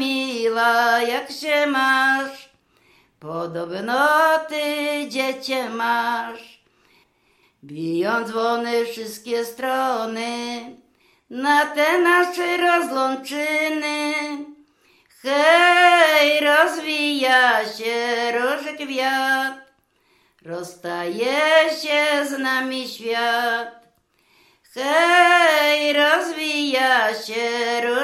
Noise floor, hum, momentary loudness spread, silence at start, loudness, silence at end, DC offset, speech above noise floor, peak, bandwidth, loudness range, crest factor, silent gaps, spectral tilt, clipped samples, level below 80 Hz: -62 dBFS; none; 14 LU; 0 s; -19 LUFS; 0 s; under 0.1%; 42 dB; -2 dBFS; 15.5 kHz; 8 LU; 18 dB; none; -2.5 dB/octave; under 0.1%; -76 dBFS